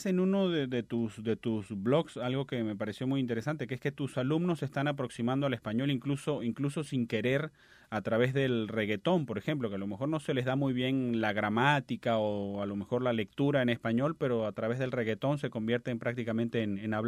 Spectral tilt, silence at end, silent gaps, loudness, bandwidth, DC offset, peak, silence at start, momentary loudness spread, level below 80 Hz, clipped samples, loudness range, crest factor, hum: -7 dB/octave; 0 s; none; -32 LUFS; 13.5 kHz; under 0.1%; -12 dBFS; 0 s; 6 LU; -68 dBFS; under 0.1%; 3 LU; 20 dB; none